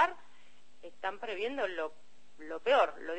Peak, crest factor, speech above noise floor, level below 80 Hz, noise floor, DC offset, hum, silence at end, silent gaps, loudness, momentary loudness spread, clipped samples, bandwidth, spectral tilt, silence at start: -14 dBFS; 20 dB; 32 dB; -74 dBFS; -65 dBFS; 0.5%; none; 0 s; none; -33 LUFS; 25 LU; under 0.1%; 8.4 kHz; -3 dB/octave; 0 s